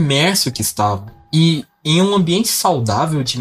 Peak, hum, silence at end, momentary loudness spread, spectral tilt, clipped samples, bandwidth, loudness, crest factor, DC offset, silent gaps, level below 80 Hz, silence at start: 0 dBFS; none; 0 s; 6 LU; -4.5 dB/octave; under 0.1%; 16 kHz; -16 LUFS; 16 dB; under 0.1%; none; -50 dBFS; 0 s